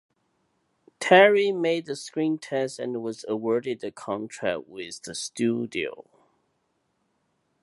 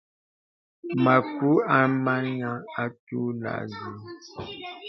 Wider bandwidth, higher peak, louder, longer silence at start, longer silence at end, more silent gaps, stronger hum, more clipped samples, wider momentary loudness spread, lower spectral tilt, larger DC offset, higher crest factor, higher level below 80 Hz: first, 11.5 kHz vs 6.2 kHz; about the same, -4 dBFS vs -4 dBFS; about the same, -25 LUFS vs -25 LUFS; first, 1 s vs 0.85 s; first, 1.6 s vs 0 s; second, none vs 2.99-3.07 s; neither; neither; about the same, 16 LU vs 18 LU; second, -4.5 dB/octave vs -8 dB/octave; neither; about the same, 24 dB vs 22 dB; second, -72 dBFS vs -66 dBFS